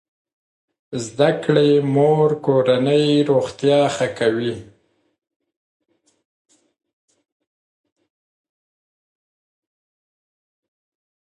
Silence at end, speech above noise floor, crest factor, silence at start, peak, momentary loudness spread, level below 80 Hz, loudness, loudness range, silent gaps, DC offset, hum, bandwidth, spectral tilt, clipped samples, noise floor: 6.7 s; over 73 dB; 20 dB; 0.9 s; -2 dBFS; 12 LU; -64 dBFS; -17 LUFS; 11 LU; none; under 0.1%; none; 11 kHz; -6.5 dB/octave; under 0.1%; under -90 dBFS